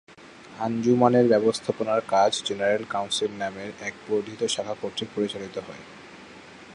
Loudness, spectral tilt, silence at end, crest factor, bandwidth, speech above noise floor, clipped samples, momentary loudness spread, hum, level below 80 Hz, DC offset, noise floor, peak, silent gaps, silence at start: -25 LUFS; -4.5 dB/octave; 0 s; 22 dB; 11.5 kHz; 22 dB; under 0.1%; 25 LU; none; -66 dBFS; under 0.1%; -46 dBFS; -4 dBFS; none; 0.2 s